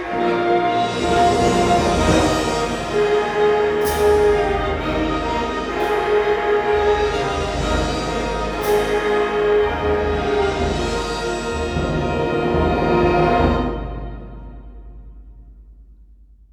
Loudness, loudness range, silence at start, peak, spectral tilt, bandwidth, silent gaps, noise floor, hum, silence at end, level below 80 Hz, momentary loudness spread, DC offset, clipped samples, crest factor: -19 LUFS; 3 LU; 0 s; -4 dBFS; -5.5 dB/octave; 19.5 kHz; none; -47 dBFS; none; 0.6 s; -30 dBFS; 7 LU; under 0.1%; under 0.1%; 16 dB